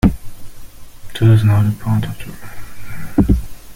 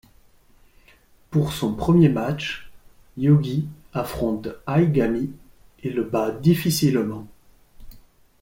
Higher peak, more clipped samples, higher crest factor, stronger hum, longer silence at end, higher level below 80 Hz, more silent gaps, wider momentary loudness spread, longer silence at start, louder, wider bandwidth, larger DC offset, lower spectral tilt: first, 0 dBFS vs -4 dBFS; neither; about the same, 16 dB vs 18 dB; neither; second, 0 s vs 0.4 s; first, -26 dBFS vs -46 dBFS; neither; first, 23 LU vs 12 LU; second, 0.05 s vs 1.3 s; first, -16 LUFS vs -22 LUFS; about the same, 16 kHz vs 16.5 kHz; neither; about the same, -8 dB/octave vs -7 dB/octave